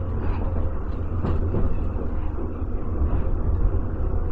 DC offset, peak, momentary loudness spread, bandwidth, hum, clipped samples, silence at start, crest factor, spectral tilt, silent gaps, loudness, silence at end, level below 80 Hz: 2%; -8 dBFS; 5 LU; 3.2 kHz; none; under 0.1%; 0 s; 14 dB; -11 dB/octave; none; -27 LUFS; 0 s; -24 dBFS